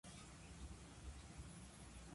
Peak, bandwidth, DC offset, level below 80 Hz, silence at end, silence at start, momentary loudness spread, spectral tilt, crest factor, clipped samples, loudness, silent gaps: -42 dBFS; 11.5 kHz; under 0.1%; -60 dBFS; 0 s; 0.05 s; 1 LU; -4 dB/octave; 14 dB; under 0.1%; -58 LUFS; none